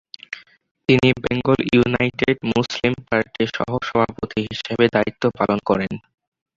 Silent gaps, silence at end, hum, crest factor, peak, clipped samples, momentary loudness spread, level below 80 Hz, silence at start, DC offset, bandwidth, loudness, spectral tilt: 0.71-0.75 s; 0.6 s; none; 20 dB; 0 dBFS; under 0.1%; 11 LU; -48 dBFS; 0.3 s; under 0.1%; 7.6 kHz; -20 LUFS; -6.5 dB/octave